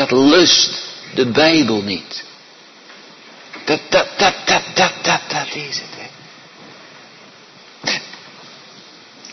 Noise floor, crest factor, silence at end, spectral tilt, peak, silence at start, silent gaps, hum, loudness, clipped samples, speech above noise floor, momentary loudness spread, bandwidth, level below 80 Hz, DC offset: -43 dBFS; 18 dB; 0 s; -3 dB/octave; 0 dBFS; 0 s; none; none; -15 LUFS; under 0.1%; 28 dB; 23 LU; 6.4 kHz; -56 dBFS; under 0.1%